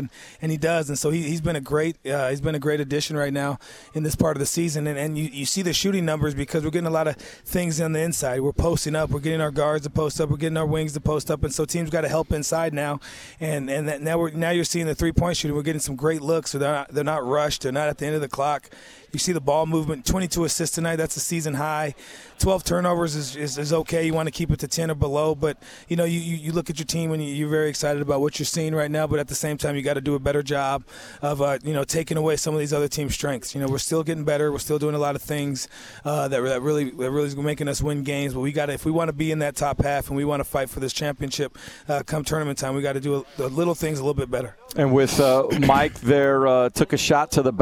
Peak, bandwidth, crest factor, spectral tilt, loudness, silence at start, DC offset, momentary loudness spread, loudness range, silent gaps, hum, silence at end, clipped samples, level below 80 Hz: -2 dBFS; 18 kHz; 22 dB; -5 dB/octave; -24 LUFS; 0 s; under 0.1%; 7 LU; 2 LU; none; none; 0 s; under 0.1%; -42 dBFS